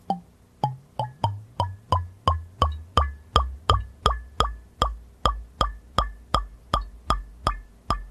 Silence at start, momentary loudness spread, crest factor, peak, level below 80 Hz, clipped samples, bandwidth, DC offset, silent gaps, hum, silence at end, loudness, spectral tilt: 0.1 s; 6 LU; 26 dB; -2 dBFS; -32 dBFS; under 0.1%; 13.5 kHz; under 0.1%; none; none; 0 s; -27 LUFS; -5 dB/octave